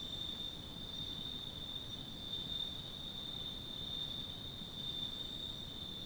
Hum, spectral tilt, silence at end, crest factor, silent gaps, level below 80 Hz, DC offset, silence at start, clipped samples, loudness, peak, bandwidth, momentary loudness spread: none; -4 dB/octave; 0 s; 14 dB; none; -56 dBFS; under 0.1%; 0 s; under 0.1%; -42 LUFS; -30 dBFS; over 20 kHz; 4 LU